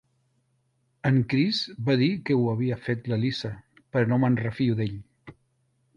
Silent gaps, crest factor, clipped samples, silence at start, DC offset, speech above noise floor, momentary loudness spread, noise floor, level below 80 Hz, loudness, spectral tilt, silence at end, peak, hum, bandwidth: none; 18 dB; under 0.1%; 1.05 s; under 0.1%; 46 dB; 9 LU; -71 dBFS; -58 dBFS; -26 LUFS; -7.5 dB/octave; 0.65 s; -8 dBFS; none; 7.2 kHz